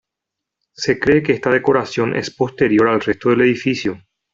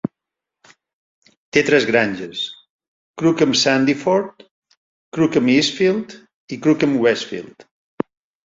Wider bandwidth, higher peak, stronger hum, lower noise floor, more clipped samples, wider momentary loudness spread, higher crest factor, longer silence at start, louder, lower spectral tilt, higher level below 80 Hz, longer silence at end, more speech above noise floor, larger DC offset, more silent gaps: about the same, 7.6 kHz vs 7.8 kHz; about the same, -2 dBFS vs -2 dBFS; neither; about the same, -82 dBFS vs -84 dBFS; neither; second, 8 LU vs 15 LU; about the same, 16 dB vs 18 dB; first, 0.8 s vs 0.05 s; about the same, -17 LUFS vs -18 LUFS; first, -6 dB/octave vs -4.5 dB/octave; first, -50 dBFS vs -60 dBFS; second, 0.35 s vs 0.85 s; about the same, 66 dB vs 67 dB; neither; second, none vs 0.93-1.22 s, 1.37-1.52 s, 2.70-2.79 s, 2.88-3.14 s, 4.51-4.62 s, 4.77-5.12 s, 6.34-6.48 s